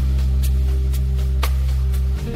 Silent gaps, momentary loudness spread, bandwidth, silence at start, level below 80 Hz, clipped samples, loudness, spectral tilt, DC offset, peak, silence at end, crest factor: none; 1 LU; 15 kHz; 0 s; -18 dBFS; under 0.1%; -21 LUFS; -6.5 dB/octave; under 0.1%; -8 dBFS; 0 s; 10 dB